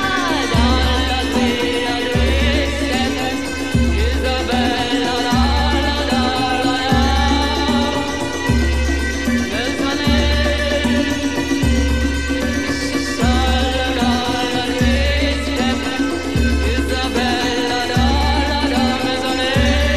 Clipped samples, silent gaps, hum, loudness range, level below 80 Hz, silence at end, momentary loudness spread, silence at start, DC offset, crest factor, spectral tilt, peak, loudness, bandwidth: under 0.1%; none; none; 1 LU; -22 dBFS; 0 s; 4 LU; 0 s; 2%; 14 dB; -5 dB/octave; -2 dBFS; -17 LUFS; 14 kHz